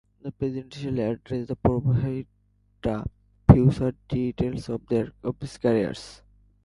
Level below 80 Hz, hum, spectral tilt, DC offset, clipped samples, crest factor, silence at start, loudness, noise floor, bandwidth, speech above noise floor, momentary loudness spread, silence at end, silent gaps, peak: -40 dBFS; 50 Hz at -45 dBFS; -9 dB/octave; under 0.1%; under 0.1%; 26 dB; 0.25 s; -25 LUFS; -56 dBFS; 11.5 kHz; 30 dB; 15 LU; 0.5 s; none; 0 dBFS